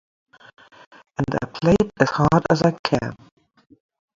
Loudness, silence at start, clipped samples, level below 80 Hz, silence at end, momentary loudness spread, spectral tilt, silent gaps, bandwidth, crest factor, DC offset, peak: -20 LUFS; 1.2 s; under 0.1%; -46 dBFS; 1 s; 10 LU; -7 dB/octave; 2.79-2.84 s; 7.6 kHz; 22 dB; under 0.1%; 0 dBFS